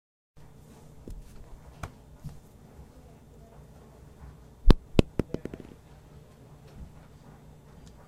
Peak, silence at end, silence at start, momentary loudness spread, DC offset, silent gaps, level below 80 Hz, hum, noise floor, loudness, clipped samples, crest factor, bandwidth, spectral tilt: 0 dBFS; 1.25 s; 1.1 s; 26 LU; under 0.1%; none; -34 dBFS; none; -52 dBFS; -30 LUFS; under 0.1%; 32 dB; 11 kHz; -7 dB/octave